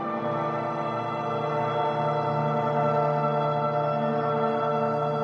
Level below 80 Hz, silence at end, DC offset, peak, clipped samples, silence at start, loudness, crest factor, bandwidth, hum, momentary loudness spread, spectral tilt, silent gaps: -68 dBFS; 0 s; under 0.1%; -12 dBFS; under 0.1%; 0 s; -26 LUFS; 14 dB; 7 kHz; none; 4 LU; -8.5 dB/octave; none